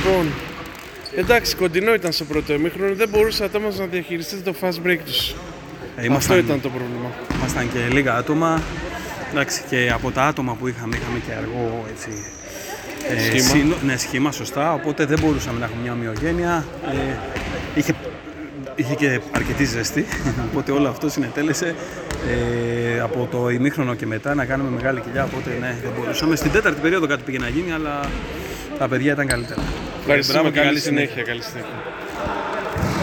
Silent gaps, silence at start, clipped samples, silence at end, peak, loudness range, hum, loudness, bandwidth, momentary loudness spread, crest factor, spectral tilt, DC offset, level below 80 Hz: none; 0 s; under 0.1%; 0 s; -2 dBFS; 3 LU; none; -21 LUFS; 19.5 kHz; 12 LU; 20 dB; -4.5 dB/octave; under 0.1%; -38 dBFS